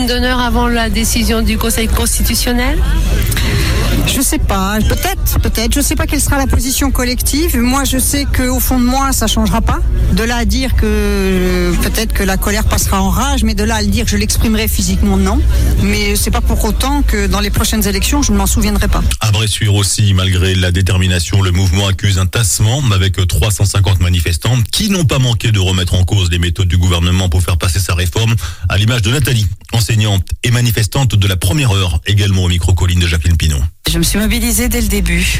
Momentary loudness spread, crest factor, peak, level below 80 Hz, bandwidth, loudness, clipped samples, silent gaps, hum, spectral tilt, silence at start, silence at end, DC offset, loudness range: 2 LU; 10 dB; -2 dBFS; -18 dBFS; 16.5 kHz; -13 LUFS; under 0.1%; none; none; -4.5 dB/octave; 0 s; 0 s; under 0.1%; 1 LU